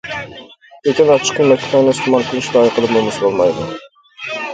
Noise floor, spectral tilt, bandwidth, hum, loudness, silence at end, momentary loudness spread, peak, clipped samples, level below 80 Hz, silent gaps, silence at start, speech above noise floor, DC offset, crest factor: -39 dBFS; -4.5 dB/octave; 9.4 kHz; none; -14 LUFS; 0 s; 14 LU; 0 dBFS; under 0.1%; -52 dBFS; none; 0.05 s; 25 dB; under 0.1%; 14 dB